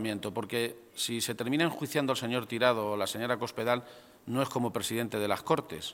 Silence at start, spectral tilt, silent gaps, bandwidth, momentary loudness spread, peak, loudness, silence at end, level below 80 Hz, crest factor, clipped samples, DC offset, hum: 0 s; -4 dB/octave; none; 17 kHz; 6 LU; -8 dBFS; -31 LUFS; 0 s; -70 dBFS; 22 dB; under 0.1%; under 0.1%; none